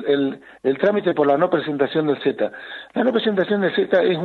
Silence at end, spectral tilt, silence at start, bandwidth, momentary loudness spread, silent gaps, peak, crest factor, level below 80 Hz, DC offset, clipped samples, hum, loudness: 0 s; -8 dB/octave; 0 s; 4.5 kHz; 8 LU; none; -2 dBFS; 18 dB; -66 dBFS; under 0.1%; under 0.1%; none; -20 LUFS